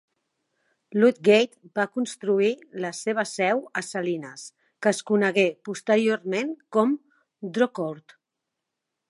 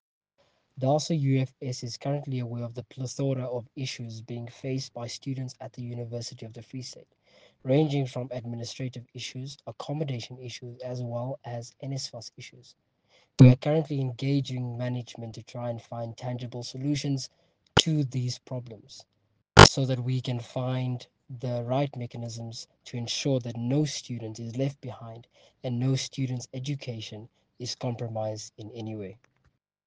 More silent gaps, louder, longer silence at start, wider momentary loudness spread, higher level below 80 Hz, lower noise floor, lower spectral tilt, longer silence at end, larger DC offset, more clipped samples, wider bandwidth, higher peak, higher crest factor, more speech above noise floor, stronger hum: neither; first, -24 LUFS vs -28 LUFS; first, 0.9 s vs 0.75 s; second, 12 LU vs 15 LU; second, -80 dBFS vs -48 dBFS; first, -84 dBFS vs -70 dBFS; about the same, -4.5 dB/octave vs -5 dB/octave; first, 1.1 s vs 0.75 s; neither; neither; first, 11.5 kHz vs 9.8 kHz; second, -6 dBFS vs -2 dBFS; second, 20 dB vs 28 dB; first, 60 dB vs 40 dB; neither